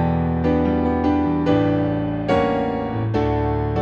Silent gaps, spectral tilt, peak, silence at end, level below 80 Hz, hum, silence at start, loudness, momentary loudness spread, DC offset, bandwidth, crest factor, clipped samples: none; -9 dB/octave; -6 dBFS; 0 s; -34 dBFS; none; 0 s; -20 LUFS; 4 LU; under 0.1%; 7 kHz; 14 dB; under 0.1%